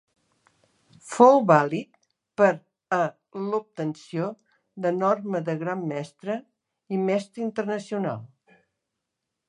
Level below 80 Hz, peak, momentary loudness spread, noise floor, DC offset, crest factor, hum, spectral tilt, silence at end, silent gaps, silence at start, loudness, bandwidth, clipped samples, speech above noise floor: -78 dBFS; -2 dBFS; 15 LU; -83 dBFS; under 0.1%; 24 dB; none; -7 dB/octave; 1.2 s; none; 1.05 s; -25 LUFS; 11 kHz; under 0.1%; 59 dB